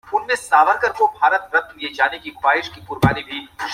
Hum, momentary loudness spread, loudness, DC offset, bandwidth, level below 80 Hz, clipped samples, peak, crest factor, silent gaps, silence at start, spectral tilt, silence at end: none; 12 LU; -18 LUFS; under 0.1%; 16 kHz; -46 dBFS; under 0.1%; -2 dBFS; 18 dB; none; 0.05 s; -5 dB/octave; 0 s